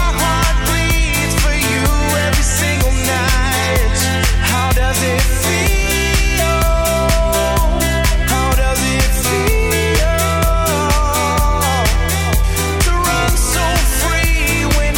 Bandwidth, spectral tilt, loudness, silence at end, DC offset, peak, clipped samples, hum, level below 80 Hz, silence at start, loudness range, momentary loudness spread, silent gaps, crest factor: 17.5 kHz; -3.5 dB/octave; -15 LUFS; 0 s; under 0.1%; -4 dBFS; under 0.1%; none; -18 dBFS; 0 s; 0 LU; 1 LU; none; 10 dB